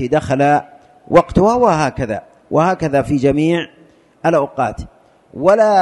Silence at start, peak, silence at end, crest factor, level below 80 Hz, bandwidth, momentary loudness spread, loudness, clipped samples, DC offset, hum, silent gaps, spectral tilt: 0 s; 0 dBFS; 0 s; 14 dB; -40 dBFS; 11.5 kHz; 10 LU; -15 LUFS; under 0.1%; under 0.1%; none; none; -7 dB/octave